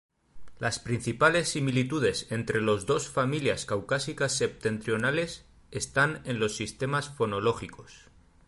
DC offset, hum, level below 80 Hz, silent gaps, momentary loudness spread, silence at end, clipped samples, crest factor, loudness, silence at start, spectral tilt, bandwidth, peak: under 0.1%; none; -56 dBFS; none; 7 LU; 0.5 s; under 0.1%; 20 dB; -28 LUFS; 0.35 s; -4.5 dB/octave; 11.5 kHz; -8 dBFS